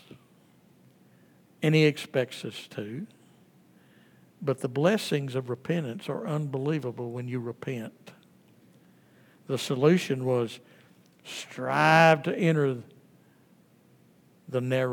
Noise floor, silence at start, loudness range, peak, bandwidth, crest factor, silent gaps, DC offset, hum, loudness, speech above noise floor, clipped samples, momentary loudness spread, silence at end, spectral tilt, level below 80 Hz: -60 dBFS; 1.6 s; 8 LU; -6 dBFS; 18 kHz; 24 dB; none; under 0.1%; none; -27 LUFS; 33 dB; under 0.1%; 16 LU; 0 s; -6 dB/octave; -82 dBFS